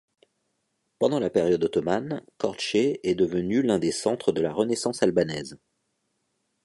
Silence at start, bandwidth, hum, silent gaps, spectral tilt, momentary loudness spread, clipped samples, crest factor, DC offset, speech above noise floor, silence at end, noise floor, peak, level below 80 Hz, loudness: 1 s; 11.5 kHz; none; none; -5 dB/octave; 7 LU; under 0.1%; 18 dB; under 0.1%; 51 dB; 1.1 s; -76 dBFS; -8 dBFS; -60 dBFS; -25 LUFS